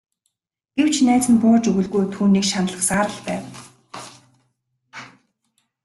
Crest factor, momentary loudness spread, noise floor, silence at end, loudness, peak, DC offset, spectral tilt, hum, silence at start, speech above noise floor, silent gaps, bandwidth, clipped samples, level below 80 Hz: 16 dB; 24 LU; -76 dBFS; 0.75 s; -19 LUFS; -6 dBFS; under 0.1%; -4.5 dB/octave; none; 0.75 s; 58 dB; none; 12.5 kHz; under 0.1%; -56 dBFS